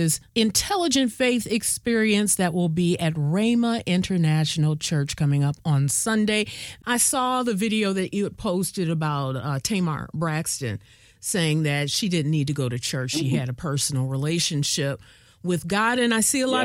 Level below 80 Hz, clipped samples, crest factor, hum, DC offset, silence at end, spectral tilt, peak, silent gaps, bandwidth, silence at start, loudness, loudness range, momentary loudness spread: -54 dBFS; under 0.1%; 16 dB; none; under 0.1%; 0 s; -4.5 dB/octave; -6 dBFS; none; 18 kHz; 0 s; -23 LUFS; 3 LU; 7 LU